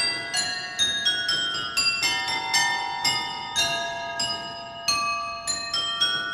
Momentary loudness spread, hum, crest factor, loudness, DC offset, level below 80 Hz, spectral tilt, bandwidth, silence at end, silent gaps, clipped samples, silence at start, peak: 6 LU; none; 18 dB; -24 LUFS; under 0.1%; -58 dBFS; 0.5 dB/octave; 16 kHz; 0 s; none; under 0.1%; 0 s; -8 dBFS